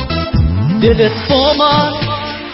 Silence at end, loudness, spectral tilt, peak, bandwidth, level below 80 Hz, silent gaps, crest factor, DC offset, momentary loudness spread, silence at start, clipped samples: 0 s; -13 LUFS; -9.5 dB/octave; 0 dBFS; 5.8 kHz; -24 dBFS; none; 12 dB; under 0.1%; 8 LU; 0 s; under 0.1%